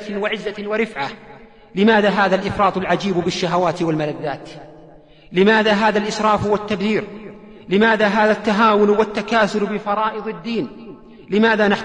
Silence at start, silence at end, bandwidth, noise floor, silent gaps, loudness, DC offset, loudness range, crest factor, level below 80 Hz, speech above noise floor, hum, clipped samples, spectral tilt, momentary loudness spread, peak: 0 s; 0 s; 9.8 kHz; -45 dBFS; none; -18 LUFS; 0.2%; 2 LU; 14 dB; -50 dBFS; 27 dB; none; under 0.1%; -5.5 dB/octave; 13 LU; -4 dBFS